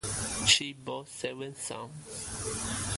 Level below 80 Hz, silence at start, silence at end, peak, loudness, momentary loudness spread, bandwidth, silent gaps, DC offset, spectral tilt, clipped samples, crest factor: -52 dBFS; 0.05 s; 0 s; -10 dBFS; -30 LUFS; 16 LU; 12 kHz; none; under 0.1%; -1.5 dB/octave; under 0.1%; 24 dB